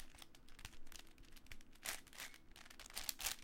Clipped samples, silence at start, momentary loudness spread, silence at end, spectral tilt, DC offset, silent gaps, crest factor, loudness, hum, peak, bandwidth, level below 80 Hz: under 0.1%; 0 s; 16 LU; 0 s; 0 dB/octave; under 0.1%; none; 30 dB; -50 LUFS; none; -20 dBFS; 17 kHz; -60 dBFS